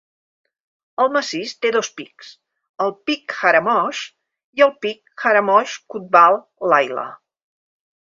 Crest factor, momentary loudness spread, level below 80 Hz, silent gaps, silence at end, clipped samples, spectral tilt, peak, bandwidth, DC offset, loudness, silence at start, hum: 20 dB; 16 LU; -70 dBFS; 2.69-2.74 s, 4.44-4.53 s; 0.95 s; under 0.1%; -3 dB/octave; 0 dBFS; 7.6 kHz; under 0.1%; -18 LUFS; 1 s; none